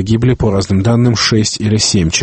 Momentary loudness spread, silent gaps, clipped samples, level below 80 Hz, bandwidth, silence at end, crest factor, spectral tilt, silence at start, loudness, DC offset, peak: 3 LU; none; under 0.1%; -30 dBFS; 8.8 kHz; 0 s; 12 dB; -4.5 dB/octave; 0 s; -12 LUFS; under 0.1%; 0 dBFS